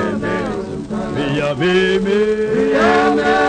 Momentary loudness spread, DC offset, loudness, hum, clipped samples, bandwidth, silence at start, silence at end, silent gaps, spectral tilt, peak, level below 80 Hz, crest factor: 10 LU; under 0.1%; -16 LUFS; none; under 0.1%; 9.6 kHz; 0 s; 0 s; none; -6 dB/octave; -2 dBFS; -40 dBFS; 14 dB